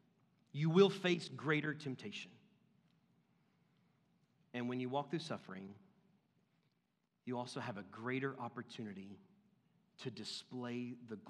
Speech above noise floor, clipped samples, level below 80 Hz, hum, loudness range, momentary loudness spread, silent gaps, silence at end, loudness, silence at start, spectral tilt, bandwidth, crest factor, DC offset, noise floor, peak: 43 dB; under 0.1%; under -90 dBFS; none; 9 LU; 17 LU; none; 0 s; -40 LUFS; 0.55 s; -6 dB/octave; 11.5 kHz; 26 dB; under 0.1%; -83 dBFS; -16 dBFS